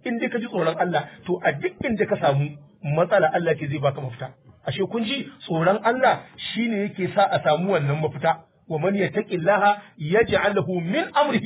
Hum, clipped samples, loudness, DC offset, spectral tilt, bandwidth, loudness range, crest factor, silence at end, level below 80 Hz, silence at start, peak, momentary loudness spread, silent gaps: none; under 0.1%; -23 LUFS; under 0.1%; -10 dB/octave; 4 kHz; 2 LU; 16 dB; 0 s; -56 dBFS; 0.05 s; -6 dBFS; 10 LU; none